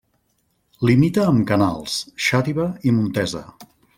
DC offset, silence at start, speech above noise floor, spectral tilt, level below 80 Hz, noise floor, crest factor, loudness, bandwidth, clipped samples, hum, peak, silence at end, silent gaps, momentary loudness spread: under 0.1%; 0.8 s; 48 dB; -6 dB/octave; -52 dBFS; -67 dBFS; 16 dB; -19 LUFS; 16.5 kHz; under 0.1%; none; -4 dBFS; 0.35 s; none; 9 LU